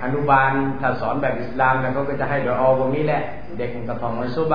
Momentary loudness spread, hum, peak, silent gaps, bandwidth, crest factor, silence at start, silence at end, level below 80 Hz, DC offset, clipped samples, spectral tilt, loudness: 11 LU; none; -2 dBFS; none; 5.2 kHz; 18 dB; 0 s; 0 s; -44 dBFS; 3%; under 0.1%; -9.5 dB/octave; -21 LUFS